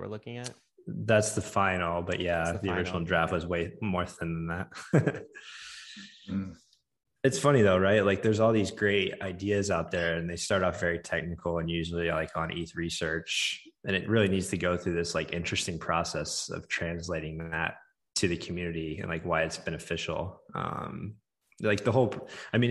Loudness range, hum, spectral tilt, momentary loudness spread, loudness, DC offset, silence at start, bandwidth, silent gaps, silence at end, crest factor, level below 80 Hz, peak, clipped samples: 6 LU; none; -5 dB/octave; 12 LU; -30 LUFS; under 0.1%; 0 s; 12.5 kHz; none; 0 s; 22 dB; -54 dBFS; -8 dBFS; under 0.1%